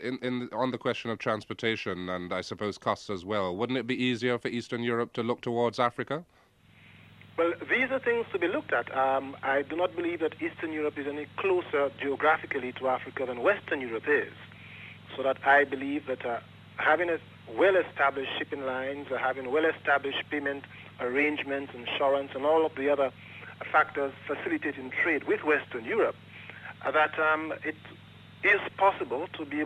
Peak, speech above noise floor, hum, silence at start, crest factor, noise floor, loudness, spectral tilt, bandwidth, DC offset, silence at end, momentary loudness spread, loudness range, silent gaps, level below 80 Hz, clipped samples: -10 dBFS; 29 dB; none; 0 s; 20 dB; -58 dBFS; -29 LUFS; -5.5 dB/octave; 10.5 kHz; under 0.1%; 0 s; 10 LU; 3 LU; none; -70 dBFS; under 0.1%